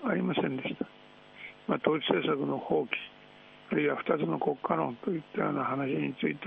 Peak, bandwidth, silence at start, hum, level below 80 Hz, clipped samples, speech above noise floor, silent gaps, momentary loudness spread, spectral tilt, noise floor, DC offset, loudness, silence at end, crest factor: -10 dBFS; 5.2 kHz; 0 s; none; -72 dBFS; under 0.1%; 24 dB; none; 10 LU; -9 dB/octave; -54 dBFS; under 0.1%; -31 LUFS; 0 s; 22 dB